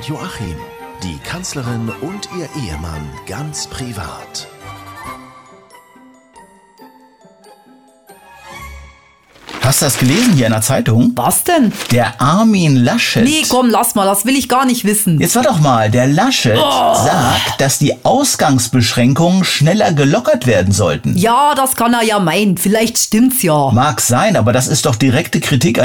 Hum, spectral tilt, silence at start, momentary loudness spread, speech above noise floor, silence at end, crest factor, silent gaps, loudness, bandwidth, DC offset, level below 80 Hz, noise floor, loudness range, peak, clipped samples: none; -4.5 dB/octave; 0 s; 16 LU; 33 dB; 0 s; 10 dB; none; -12 LUFS; over 20 kHz; under 0.1%; -42 dBFS; -46 dBFS; 14 LU; -2 dBFS; under 0.1%